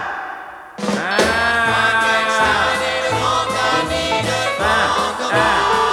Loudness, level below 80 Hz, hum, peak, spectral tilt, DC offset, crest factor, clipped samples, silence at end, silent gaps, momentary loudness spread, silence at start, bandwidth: -16 LUFS; -42 dBFS; none; -2 dBFS; -3 dB/octave; under 0.1%; 16 dB; under 0.1%; 0 s; none; 9 LU; 0 s; 20 kHz